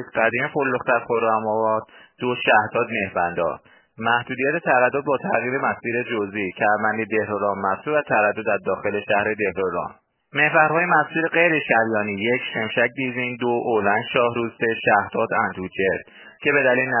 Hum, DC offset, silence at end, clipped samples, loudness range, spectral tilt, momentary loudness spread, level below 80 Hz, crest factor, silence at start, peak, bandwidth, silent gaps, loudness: none; under 0.1%; 0 s; under 0.1%; 3 LU; -9 dB/octave; 7 LU; -58 dBFS; 20 dB; 0 s; -2 dBFS; 3.2 kHz; none; -21 LUFS